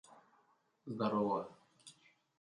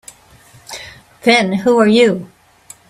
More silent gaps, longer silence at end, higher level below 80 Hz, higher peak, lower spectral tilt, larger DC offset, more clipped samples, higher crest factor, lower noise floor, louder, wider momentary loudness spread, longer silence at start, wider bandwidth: neither; second, 0.5 s vs 0.65 s; second, -82 dBFS vs -56 dBFS; second, -22 dBFS vs 0 dBFS; first, -7 dB/octave vs -5 dB/octave; neither; neither; about the same, 20 dB vs 16 dB; first, -75 dBFS vs -45 dBFS; second, -38 LUFS vs -13 LUFS; first, 24 LU vs 20 LU; second, 0.1 s vs 0.7 s; second, 11 kHz vs 14 kHz